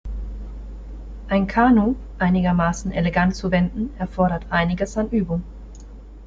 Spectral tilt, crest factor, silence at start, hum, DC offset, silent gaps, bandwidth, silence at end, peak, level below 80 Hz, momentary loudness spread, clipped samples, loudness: -7 dB/octave; 18 dB; 0.05 s; none; under 0.1%; none; 7.6 kHz; 0 s; -4 dBFS; -34 dBFS; 20 LU; under 0.1%; -21 LUFS